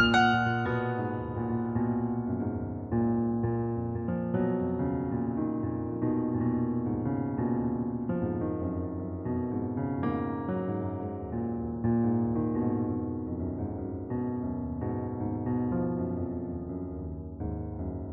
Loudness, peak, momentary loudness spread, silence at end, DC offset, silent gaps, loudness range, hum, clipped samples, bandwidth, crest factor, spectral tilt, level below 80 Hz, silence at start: -31 LUFS; -10 dBFS; 7 LU; 0 s; under 0.1%; none; 3 LU; none; under 0.1%; 4.8 kHz; 20 dB; -6 dB/octave; -48 dBFS; 0 s